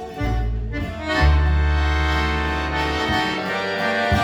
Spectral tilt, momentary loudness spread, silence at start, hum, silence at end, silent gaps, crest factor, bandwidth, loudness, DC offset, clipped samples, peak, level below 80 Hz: -6 dB/octave; 8 LU; 0 s; none; 0 s; none; 14 dB; 11.5 kHz; -21 LUFS; under 0.1%; under 0.1%; -6 dBFS; -24 dBFS